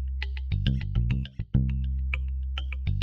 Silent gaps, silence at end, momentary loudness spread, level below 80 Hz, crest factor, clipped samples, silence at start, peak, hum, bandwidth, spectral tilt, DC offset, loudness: none; 0 s; 5 LU; -30 dBFS; 16 dB; under 0.1%; 0 s; -12 dBFS; none; 5.4 kHz; -8 dB/octave; under 0.1%; -30 LUFS